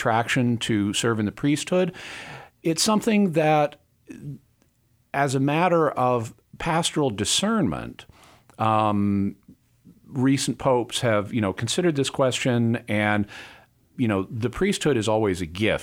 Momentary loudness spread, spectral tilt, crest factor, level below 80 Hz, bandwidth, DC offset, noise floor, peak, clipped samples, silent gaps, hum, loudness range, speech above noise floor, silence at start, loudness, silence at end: 13 LU; -5 dB/octave; 18 dB; -52 dBFS; 16.5 kHz; under 0.1%; -64 dBFS; -6 dBFS; under 0.1%; none; none; 2 LU; 42 dB; 0 s; -23 LUFS; 0 s